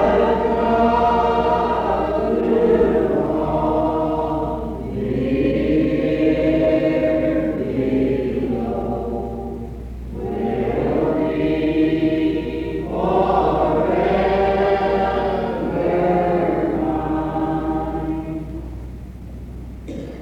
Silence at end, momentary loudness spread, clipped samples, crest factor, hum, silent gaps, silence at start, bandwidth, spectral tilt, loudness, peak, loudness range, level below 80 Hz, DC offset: 0 s; 13 LU; under 0.1%; 14 dB; none; none; 0 s; 8 kHz; -8.5 dB/octave; -19 LUFS; -4 dBFS; 5 LU; -34 dBFS; under 0.1%